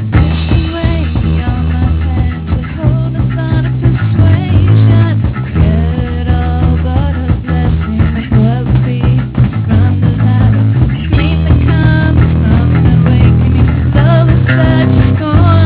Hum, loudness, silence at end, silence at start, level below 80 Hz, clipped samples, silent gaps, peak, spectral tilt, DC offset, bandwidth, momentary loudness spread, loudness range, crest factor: none; -11 LUFS; 0 s; 0 s; -16 dBFS; 0.3%; none; 0 dBFS; -12 dB/octave; under 0.1%; 4 kHz; 6 LU; 4 LU; 8 dB